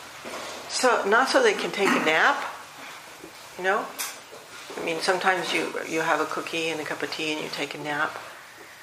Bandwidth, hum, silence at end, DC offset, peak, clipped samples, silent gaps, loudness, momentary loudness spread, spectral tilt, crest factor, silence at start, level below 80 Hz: 15.5 kHz; none; 0 s; under 0.1%; -4 dBFS; under 0.1%; none; -25 LUFS; 21 LU; -2.5 dB/octave; 22 dB; 0 s; -72 dBFS